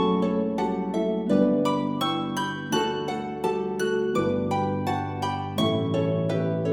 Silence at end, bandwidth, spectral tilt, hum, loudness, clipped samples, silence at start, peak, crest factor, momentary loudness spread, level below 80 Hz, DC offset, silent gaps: 0 s; 18 kHz; -6.5 dB/octave; none; -26 LUFS; under 0.1%; 0 s; -8 dBFS; 16 dB; 6 LU; -58 dBFS; under 0.1%; none